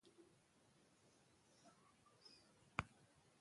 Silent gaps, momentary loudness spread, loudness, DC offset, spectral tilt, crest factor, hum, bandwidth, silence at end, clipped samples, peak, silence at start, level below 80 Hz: none; 18 LU; -51 LUFS; under 0.1%; -4.5 dB/octave; 38 dB; none; 11.5 kHz; 0 s; under 0.1%; -22 dBFS; 0.05 s; -76 dBFS